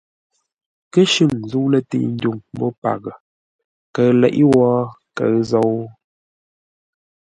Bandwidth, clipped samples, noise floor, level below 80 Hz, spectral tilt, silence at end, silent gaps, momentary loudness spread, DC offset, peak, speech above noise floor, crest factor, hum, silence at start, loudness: 11 kHz; under 0.1%; under -90 dBFS; -56 dBFS; -6 dB/octave; 1.3 s; 2.78-2.82 s, 3.20-3.94 s; 13 LU; under 0.1%; 0 dBFS; over 74 dB; 18 dB; none; 0.95 s; -17 LUFS